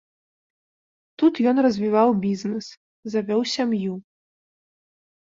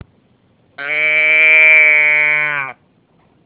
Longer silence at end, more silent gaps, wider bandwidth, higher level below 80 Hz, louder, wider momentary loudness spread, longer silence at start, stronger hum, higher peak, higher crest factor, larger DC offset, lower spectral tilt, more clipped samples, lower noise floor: first, 1.4 s vs 0.75 s; first, 2.77-3.03 s vs none; first, 7.8 kHz vs 4 kHz; second, -68 dBFS vs -62 dBFS; second, -22 LUFS vs -8 LUFS; second, 13 LU vs 16 LU; first, 1.2 s vs 0.8 s; neither; second, -6 dBFS vs 0 dBFS; about the same, 18 dB vs 14 dB; neither; first, -6 dB/octave vs -4.5 dB/octave; neither; first, under -90 dBFS vs -55 dBFS